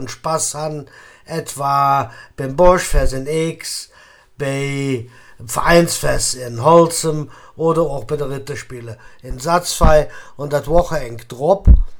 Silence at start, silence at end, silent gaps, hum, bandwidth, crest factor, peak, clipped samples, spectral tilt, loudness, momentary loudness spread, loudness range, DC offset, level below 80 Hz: 0 s; 0 s; none; none; 19 kHz; 16 dB; 0 dBFS; under 0.1%; -5 dB/octave; -17 LUFS; 16 LU; 3 LU; under 0.1%; -24 dBFS